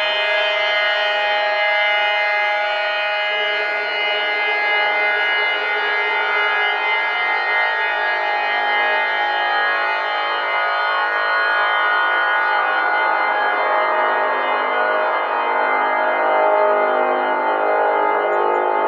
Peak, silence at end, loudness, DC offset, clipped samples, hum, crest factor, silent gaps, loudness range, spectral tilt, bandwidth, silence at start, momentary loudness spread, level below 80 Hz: -4 dBFS; 0 s; -17 LUFS; under 0.1%; under 0.1%; none; 14 dB; none; 1 LU; -1.5 dB/octave; 7.2 kHz; 0 s; 2 LU; -86 dBFS